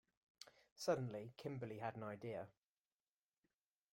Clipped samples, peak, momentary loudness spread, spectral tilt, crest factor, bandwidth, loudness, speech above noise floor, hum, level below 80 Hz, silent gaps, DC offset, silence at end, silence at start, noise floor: under 0.1%; -26 dBFS; 20 LU; -5.5 dB/octave; 24 dB; 16.5 kHz; -47 LUFS; over 44 dB; none; -84 dBFS; 0.72-0.76 s; under 0.1%; 1.4 s; 0.4 s; under -90 dBFS